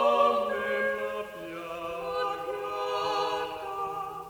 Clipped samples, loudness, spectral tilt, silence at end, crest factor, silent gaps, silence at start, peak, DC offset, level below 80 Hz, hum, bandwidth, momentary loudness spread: under 0.1%; -30 LUFS; -3.5 dB/octave; 0 s; 18 dB; none; 0 s; -10 dBFS; under 0.1%; -64 dBFS; none; over 20 kHz; 12 LU